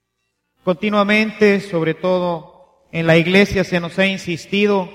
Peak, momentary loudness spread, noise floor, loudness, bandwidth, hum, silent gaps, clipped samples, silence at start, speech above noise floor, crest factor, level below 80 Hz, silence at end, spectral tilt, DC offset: 0 dBFS; 10 LU; -73 dBFS; -17 LUFS; 13.5 kHz; none; none; under 0.1%; 0.65 s; 56 dB; 16 dB; -46 dBFS; 0 s; -6 dB/octave; under 0.1%